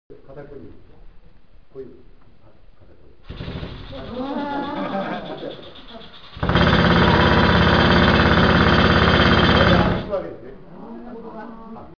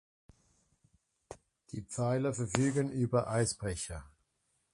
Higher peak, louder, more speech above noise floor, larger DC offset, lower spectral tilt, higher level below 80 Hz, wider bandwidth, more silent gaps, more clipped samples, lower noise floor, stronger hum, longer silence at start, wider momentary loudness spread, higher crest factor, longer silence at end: first, -4 dBFS vs -10 dBFS; first, -17 LUFS vs -33 LUFS; second, 18 dB vs 46 dB; first, 0.7% vs under 0.1%; first, -7 dB/octave vs -5.5 dB/octave; first, -32 dBFS vs -56 dBFS; second, 5.4 kHz vs 11.5 kHz; neither; neither; second, -51 dBFS vs -79 dBFS; neither; second, 0.1 s vs 1.3 s; about the same, 25 LU vs 23 LU; second, 16 dB vs 26 dB; second, 0.15 s vs 0.65 s